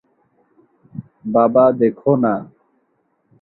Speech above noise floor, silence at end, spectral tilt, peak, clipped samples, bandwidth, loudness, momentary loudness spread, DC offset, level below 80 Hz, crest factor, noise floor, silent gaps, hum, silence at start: 51 dB; 0.95 s; -13.5 dB/octave; 0 dBFS; under 0.1%; 4.1 kHz; -16 LUFS; 23 LU; under 0.1%; -60 dBFS; 18 dB; -65 dBFS; none; none; 0.95 s